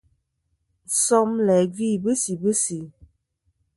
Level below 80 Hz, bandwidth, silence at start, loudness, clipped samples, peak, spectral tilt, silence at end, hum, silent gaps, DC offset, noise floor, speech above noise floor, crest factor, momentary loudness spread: -62 dBFS; 12 kHz; 0.9 s; -21 LUFS; under 0.1%; -6 dBFS; -4.5 dB/octave; 0.85 s; none; none; under 0.1%; -73 dBFS; 52 dB; 18 dB; 7 LU